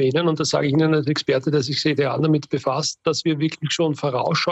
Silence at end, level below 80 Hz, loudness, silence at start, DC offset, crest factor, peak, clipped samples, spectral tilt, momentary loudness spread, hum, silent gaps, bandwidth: 0 s; -60 dBFS; -21 LUFS; 0 s; under 0.1%; 14 dB; -6 dBFS; under 0.1%; -5 dB/octave; 4 LU; none; none; 8.4 kHz